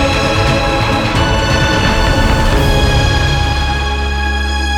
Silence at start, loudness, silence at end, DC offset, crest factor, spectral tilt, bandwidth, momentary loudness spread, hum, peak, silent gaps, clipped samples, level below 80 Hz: 0 s; -13 LUFS; 0 s; under 0.1%; 12 dB; -5 dB/octave; 16 kHz; 4 LU; none; 0 dBFS; none; under 0.1%; -16 dBFS